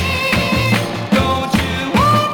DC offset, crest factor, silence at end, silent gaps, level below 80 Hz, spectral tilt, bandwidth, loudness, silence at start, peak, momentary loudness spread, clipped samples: under 0.1%; 14 dB; 0 s; none; -34 dBFS; -5 dB/octave; over 20 kHz; -15 LUFS; 0 s; -2 dBFS; 4 LU; under 0.1%